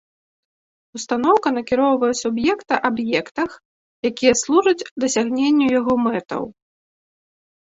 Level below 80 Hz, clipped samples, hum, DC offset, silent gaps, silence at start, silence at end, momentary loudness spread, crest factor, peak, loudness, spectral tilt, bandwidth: -58 dBFS; under 0.1%; none; under 0.1%; 3.65-4.03 s, 4.91-4.96 s; 0.95 s; 1.25 s; 10 LU; 18 dB; -2 dBFS; -19 LUFS; -3.5 dB/octave; 8 kHz